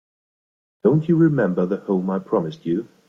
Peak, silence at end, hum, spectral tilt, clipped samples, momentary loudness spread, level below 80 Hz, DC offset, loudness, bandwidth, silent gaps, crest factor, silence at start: -4 dBFS; 0.25 s; none; -10 dB/octave; under 0.1%; 8 LU; -62 dBFS; under 0.1%; -21 LUFS; 6.6 kHz; none; 16 dB; 0.85 s